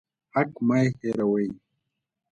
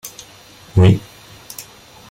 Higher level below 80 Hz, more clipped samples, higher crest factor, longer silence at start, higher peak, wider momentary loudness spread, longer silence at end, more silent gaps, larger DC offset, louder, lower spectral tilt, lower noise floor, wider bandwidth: second, -64 dBFS vs -42 dBFS; neither; about the same, 18 dB vs 18 dB; first, 0.35 s vs 0.05 s; second, -10 dBFS vs -2 dBFS; second, 8 LU vs 25 LU; first, 0.75 s vs 0.5 s; neither; neither; second, -26 LUFS vs -15 LUFS; about the same, -8 dB/octave vs -7 dB/octave; first, -80 dBFS vs -43 dBFS; second, 8.8 kHz vs 17 kHz